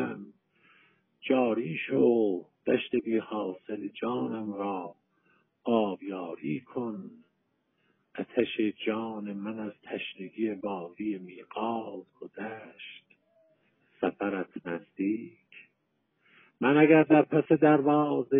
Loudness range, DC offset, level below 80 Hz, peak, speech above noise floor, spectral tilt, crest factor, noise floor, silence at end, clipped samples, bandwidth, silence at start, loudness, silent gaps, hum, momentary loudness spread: 10 LU; under 0.1%; -80 dBFS; -8 dBFS; 48 dB; -5.5 dB/octave; 22 dB; -76 dBFS; 0 s; under 0.1%; 3.8 kHz; 0 s; -29 LUFS; none; none; 18 LU